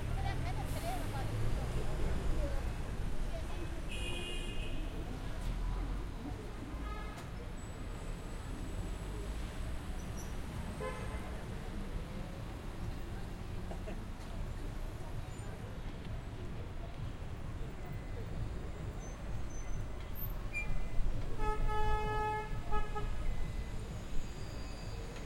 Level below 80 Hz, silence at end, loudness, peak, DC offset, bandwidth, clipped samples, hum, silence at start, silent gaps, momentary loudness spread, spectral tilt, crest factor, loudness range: -40 dBFS; 0 s; -42 LUFS; -18 dBFS; under 0.1%; 16 kHz; under 0.1%; none; 0 s; none; 7 LU; -5.5 dB/octave; 18 dB; 6 LU